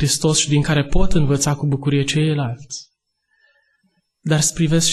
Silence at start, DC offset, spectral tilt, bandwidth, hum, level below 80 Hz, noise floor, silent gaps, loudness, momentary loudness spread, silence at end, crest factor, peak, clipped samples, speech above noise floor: 0 s; under 0.1%; -4.5 dB/octave; 12.5 kHz; none; -28 dBFS; -69 dBFS; none; -18 LUFS; 13 LU; 0 s; 14 dB; -4 dBFS; under 0.1%; 52 dB